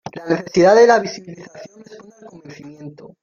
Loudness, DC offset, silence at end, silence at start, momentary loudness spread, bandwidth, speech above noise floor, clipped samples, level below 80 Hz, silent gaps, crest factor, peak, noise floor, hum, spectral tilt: -14 LUFS; under 0.1%; 0.15 s; 0.05 s; 27 LU; 7.2 kHz; 27 dB; under 0.1%; -60 dBFS; none; 16 dB; -2 dBFS; -42 dBFS; none; -5 dB/octave